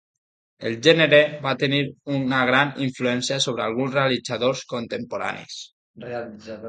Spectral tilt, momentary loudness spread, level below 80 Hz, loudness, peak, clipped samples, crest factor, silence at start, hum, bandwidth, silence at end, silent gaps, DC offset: -4.5 dB/octave; 16 LU; -62 dBFS; -21 LUFS; 0 dBFS; under 0.1%; 22 dB; 0.6 s; none; 9.4 kHz; 0 s; 5.73-5.94 s; under 0.1%